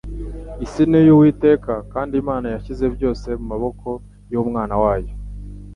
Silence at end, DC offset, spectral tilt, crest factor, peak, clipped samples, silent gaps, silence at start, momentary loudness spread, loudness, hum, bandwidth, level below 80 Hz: 0 s; under 0.1%; -9 dB/octave; 16 dB; -2 dBFS; under 0.1%; none; 0.05 s; 20 LU; -18 LUFS; 50 Hz at -35 dBFS; 7.2 kHz; -34 dBFS